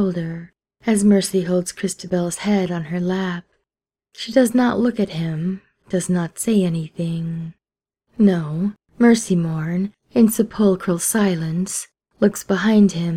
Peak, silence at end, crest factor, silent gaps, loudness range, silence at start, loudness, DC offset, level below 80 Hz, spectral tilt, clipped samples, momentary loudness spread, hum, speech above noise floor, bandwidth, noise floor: -2 dBFS; 0 s; 18 dB; none; 3 LU; 0 s; -20 LUFS; under 0.1%; -56 dBFS; -5.5 dB/octave; under 0.1%; 12 LU; none; 68 dB; 16 kHz; -87 dBFS